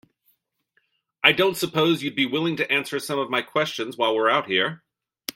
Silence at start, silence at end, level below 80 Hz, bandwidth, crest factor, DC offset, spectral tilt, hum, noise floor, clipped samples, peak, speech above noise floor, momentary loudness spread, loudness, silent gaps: 1.25 s; 0.05 s; -68 dBFS; 16.5 kHz; 24 dB; under 0.1%; -4 dB/octave; none; -70 dBFS; under 0.1%; 0 dBFS; 47 dB; 8 LU; -22 LUFS; none